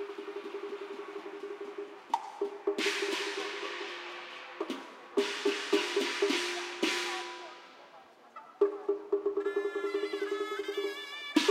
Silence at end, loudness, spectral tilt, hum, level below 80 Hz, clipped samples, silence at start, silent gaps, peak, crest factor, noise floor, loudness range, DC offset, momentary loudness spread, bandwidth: 0 s; -34 LUFS; -1.5 dB/octave; none; under -90 dBFS; under 0.1%; 0 s; none; -12 dBFS; 22 dB; -56 dBFS; 3 LU; under 0.1%; 13 LU; 15.5 kHz